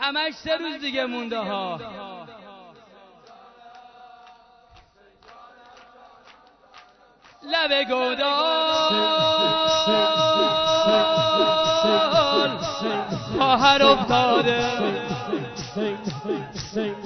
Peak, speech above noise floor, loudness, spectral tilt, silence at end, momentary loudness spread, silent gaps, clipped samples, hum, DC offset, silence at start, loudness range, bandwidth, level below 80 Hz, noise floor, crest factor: -2 dBFS; 32 dB; -21 LUFS; -4 dB/octave; 0 s; 11 LU; none; under 0.1%; none; under 0.1%; 0 s; 13 LU; 6.4 kHz; -56 dBFS; -54 dBFS; 22 dB